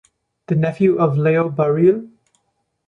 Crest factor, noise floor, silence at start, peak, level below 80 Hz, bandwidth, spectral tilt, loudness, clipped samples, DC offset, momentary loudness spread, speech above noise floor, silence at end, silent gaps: 14 dB; -70 dBFS; 0.5 s; -4 dBFS; -60 dBFS; 6 kHz; -10 dB/octave; -17 LUFS; under 0.1%; under 0.1%; 6 LU; 54 dB; 0.8 s; none